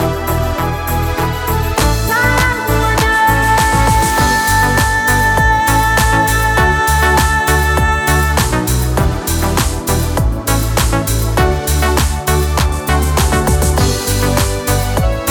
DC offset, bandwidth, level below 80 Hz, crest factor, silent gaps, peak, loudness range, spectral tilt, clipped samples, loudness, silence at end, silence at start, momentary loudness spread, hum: under 0.1%; 20 kHz; -18 dBFS; 12 dB; none; 0 dBFS; 3 LU; -4 dB/octave; under 0.1%; -13 LUFS; 0 s; 0 s; 5 LU; none